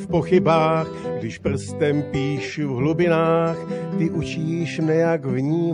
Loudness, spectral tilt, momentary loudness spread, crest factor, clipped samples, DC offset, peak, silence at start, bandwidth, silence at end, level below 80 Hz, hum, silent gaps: -21 LUFS; -7.5 dB/octave; 8 LU; 14 dB; under 0.1%; under 0.1%; -6 dBFS; 0 s; 10.5 kHz; 0 s; -48 dBFS; none; none